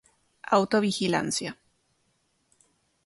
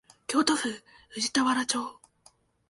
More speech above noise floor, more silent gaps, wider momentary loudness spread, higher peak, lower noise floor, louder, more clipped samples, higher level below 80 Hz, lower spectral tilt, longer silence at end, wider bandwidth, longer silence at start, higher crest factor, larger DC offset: first, 47 dB vs 34 dB; neither; second, 13 LU vs 16 LU; about the same, -8 dBFS vs -10 dBFS; first, -72 dBFS vs -62 dBFS; about the same, -26 LUFS vs -27 LUFS; neither; about the same, -68 dBFS vs -70 dBFS; first, -4 dB/octave vs -1.5 dB/octave; first, 1.5 s vs 0.8 s; about the same, 11.5 kHz vs 11.5 kHz; first, 0.45 s vs 0.3 s; about the same, 22 dB vs 20 dB; neither